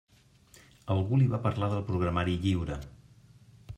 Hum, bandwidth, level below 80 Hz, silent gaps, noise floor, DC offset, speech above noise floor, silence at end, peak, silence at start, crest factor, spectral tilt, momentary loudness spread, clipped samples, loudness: none; 10 kHz; -52 dBFS; none; -60 dBFS; under 0.1%; 31 dB; 0 s; -14 dBFS; 0.85 s; 16 dB; -8 dB/octave; 14 LU; under 0.1%; -29 LUFS